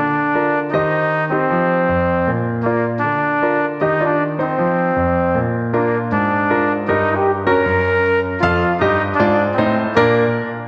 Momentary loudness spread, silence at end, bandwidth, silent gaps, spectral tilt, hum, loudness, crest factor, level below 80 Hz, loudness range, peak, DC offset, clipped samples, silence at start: 3 LU; 0 s; 7.2 kHz; none; -8.5 dB/octave; none; -17 LUFS; 14 dB; -44 dBFS; 2 LU; -2 dBFS; under 0.1%; under 0.1%; 0 s